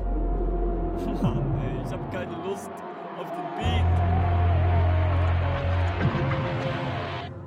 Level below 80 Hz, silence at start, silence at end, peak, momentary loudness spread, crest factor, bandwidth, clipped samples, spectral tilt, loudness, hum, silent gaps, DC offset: -32 dBFS; 0 s; 0 s; -12 dBFS; 10 LU; 12 dB; 7.2 kHz; under 0.1%; -8 dB/octave; -27 LUFS; none; none; under 0.1%